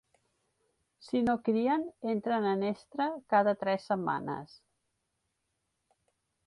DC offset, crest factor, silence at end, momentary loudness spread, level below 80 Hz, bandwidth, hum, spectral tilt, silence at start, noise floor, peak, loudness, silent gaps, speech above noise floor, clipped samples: under 0.1%; 20 dB; 2 s; 7 LU; -70 dBFS; 11 kHz; none; -7.5 dB/octave; 1 s; -82 dBFS; -12 dBFS; -31 LUFS; none; 51 dB; under 0.1%